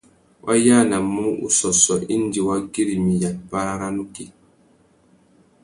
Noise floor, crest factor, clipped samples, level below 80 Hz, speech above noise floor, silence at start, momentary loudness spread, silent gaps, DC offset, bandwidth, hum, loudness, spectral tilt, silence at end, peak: -57 dBFS; 20 dB; under 0.1%; -52 dBFS; 37 dB; 0.45 s; 14 LU; none; under 0.1%; 11.5 kHz; none; -19 LUFS; -4 dB/octave; 1.35 s; -2 dBFS